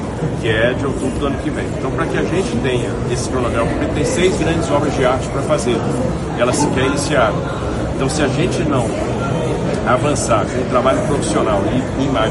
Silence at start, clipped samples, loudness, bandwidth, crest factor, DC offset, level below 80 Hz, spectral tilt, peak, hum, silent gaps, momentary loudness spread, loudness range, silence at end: 0 s; under 0.1%; -17 LUFS; 11.5 kHz; 16 dB; under 0.1%; -30 dBFS; -5.5 dB/octave; -2 dBFS; none; none; 5 LU; 2 LU; 0 s